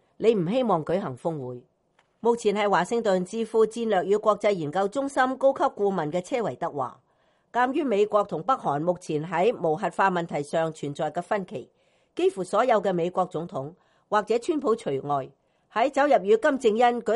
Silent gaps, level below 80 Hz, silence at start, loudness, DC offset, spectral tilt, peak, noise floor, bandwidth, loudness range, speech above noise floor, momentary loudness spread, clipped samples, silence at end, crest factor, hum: none; -68 dBFS; 0.2 s; -25 LUFS; under 0.1%; -6 dB/octave; -8 dBFS; -67 dBFS; 11.5 kHz; 3 LU; 43 dB; 9 LU; under 0.1%; 0 s; 18 dB; none